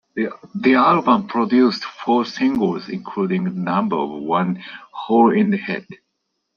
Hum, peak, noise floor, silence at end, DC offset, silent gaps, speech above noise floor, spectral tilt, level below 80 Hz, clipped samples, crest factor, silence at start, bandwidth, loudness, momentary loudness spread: none; -2 dBFS; -74 dBFS; 0.6 s; under 0.1%; none; 56 dB; -7.5 dB/octave; -62 dBFS; under 0.1%; 16 dB; 0.15 s; 7 kHz; -19 LUFS; 13 LU